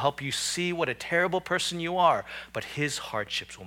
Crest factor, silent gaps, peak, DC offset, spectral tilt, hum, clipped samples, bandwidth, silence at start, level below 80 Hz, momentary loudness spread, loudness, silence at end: 20 dB; none; -10 dBFS; under 0.1%; -3 dB/octave; none; under 0.1%; 18 kHz; 0 s; -60 dBFS; 8 LU; -28 LUFS; 0 s